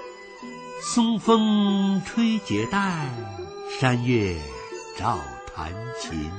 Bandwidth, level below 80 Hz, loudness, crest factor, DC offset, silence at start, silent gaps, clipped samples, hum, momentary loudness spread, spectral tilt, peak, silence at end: 9.2 kHz; -48 dBFS; -24 LUFS; 18 dB; under 0.1%; 0 s; none; under 0.1%; none; 16 LU; -5.5 dB/octave; -6 dBFS; 0 s